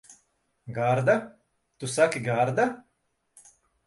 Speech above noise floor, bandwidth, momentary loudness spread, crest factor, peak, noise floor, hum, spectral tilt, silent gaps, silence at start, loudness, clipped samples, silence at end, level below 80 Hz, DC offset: 50 dB; 11.5 kHz; 15 LU; 20 dB; -8 dBFS; -74 dBFS; none; -5.5 dB/octave; none; 0.1 s; -26 LUFS; under 0.1%; 1.05 s; -68 dBFS; under 0.1%